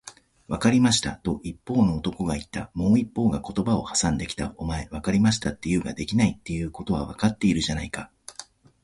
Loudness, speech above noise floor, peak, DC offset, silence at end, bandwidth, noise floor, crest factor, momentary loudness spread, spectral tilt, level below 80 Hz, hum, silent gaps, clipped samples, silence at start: -25 LUFS; 22 dB; -8 dBFS; under 0.1%; 0.4 s; 11.5 kHz; -47 dBFS; 18 dB; 12 LU; -5 dB/octave; -42 dBFS; none; none; under 0.1%; 0.05 s